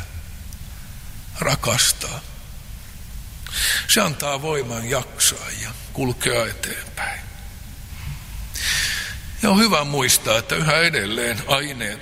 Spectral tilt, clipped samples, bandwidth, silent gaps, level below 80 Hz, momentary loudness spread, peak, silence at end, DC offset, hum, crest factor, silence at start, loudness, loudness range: -2.5 dB/octave; under 0.1%; 16 kHz; none; -38 dBFS; 22 LU; 0 dBFS; 0 s; under 0.1%; none; 22 dB; 0 s; -20 LUFS; 6 LU